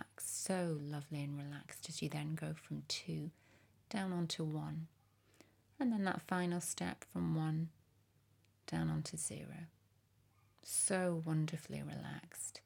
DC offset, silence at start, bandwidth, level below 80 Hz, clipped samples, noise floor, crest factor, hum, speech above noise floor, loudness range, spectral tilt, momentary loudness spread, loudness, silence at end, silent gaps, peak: under 0.1%; 0 s; 18.5 kHz; -76 dBFS; under 0.1%; -73 dBFS; 18 dB; none; 33 dB; 4 LU; -4.5 dB/octave; 11 LU; -41 LUFS; 0.05 s; none; -24 dBFS